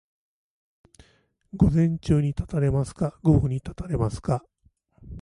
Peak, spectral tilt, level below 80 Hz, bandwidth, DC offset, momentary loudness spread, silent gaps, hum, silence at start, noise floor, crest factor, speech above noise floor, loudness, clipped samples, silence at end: -6 dBFS; -9 dB/octave; -38 dBFS; 11 kHz; under 0.1%; 10 LU; none; none; 1.55 s; -64 dBFS; 20 dB; 41 dB; -24 LUFS; under 0.1%; 0 s